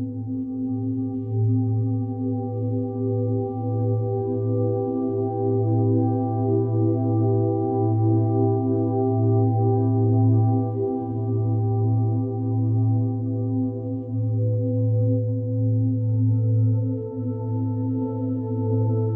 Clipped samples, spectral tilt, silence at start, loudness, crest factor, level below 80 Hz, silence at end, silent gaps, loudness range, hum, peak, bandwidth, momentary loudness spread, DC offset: under 0.1%; -15.5 dB/octave; 0 s; -23 LUFS; 12 dB; -58 dBFS; 0 s; none; 4 LU; none; -10 dBFS; 1.4 kHz; 6 LU; under 0.1%